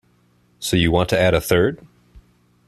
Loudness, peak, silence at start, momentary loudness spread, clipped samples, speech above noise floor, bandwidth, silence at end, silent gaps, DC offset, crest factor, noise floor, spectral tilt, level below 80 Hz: -18 LUFS; -2 dBFS; 0.6 s; 10 LU; under 0.1%; 41 dB; 14 kHz; 0.5 s; none; under 0.1%; 18 dB; -59 dBFS; -5 dB/octave; -40 dBFS